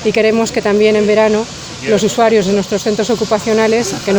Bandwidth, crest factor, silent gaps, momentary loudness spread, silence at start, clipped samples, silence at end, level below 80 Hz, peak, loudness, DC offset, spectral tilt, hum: over 20 kHz; 12 dB; none; 5 LU; 0 s; under 0.1%; 0 s; -44 dBFS; 0 dBFS; -13 LUFS; under 0.1%; -4.5 dB/octave; none